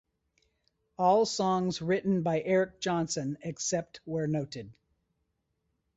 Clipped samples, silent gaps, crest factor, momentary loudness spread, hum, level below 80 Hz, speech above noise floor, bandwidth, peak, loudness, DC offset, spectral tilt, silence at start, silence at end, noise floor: under 0.1%; none; 18 dB; 9 LU; none; -66 dBFS; 50 dB; 8.4 kHz; -14 dBFS; -30 LUFS; under 0.1%; -5 dB/octave; 1 s; 1.25 s; -79 dBFS